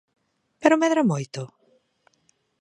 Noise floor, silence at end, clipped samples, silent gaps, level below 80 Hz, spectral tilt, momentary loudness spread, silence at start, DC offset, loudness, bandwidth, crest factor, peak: -67 dBFS; 1.15 s; under 0.1%; none; -76 dBFS; -6 dB/octave; 17 LU; 0.6 s; under 0.1%; -22 LUFS; 10.5 kHz; 22 dB; -2 dBFS